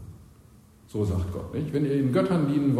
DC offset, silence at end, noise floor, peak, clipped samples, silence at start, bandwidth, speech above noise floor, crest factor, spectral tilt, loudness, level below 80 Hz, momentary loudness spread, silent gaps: under 0.1%; 0 s; -53 dBFS; -12 dBFS; under 0.1%; 0 s; 14 kHz; 29 dB; 16 dB; -8.5 dB/octave; -26 LUFS; -48 dBFS; 10 LU; none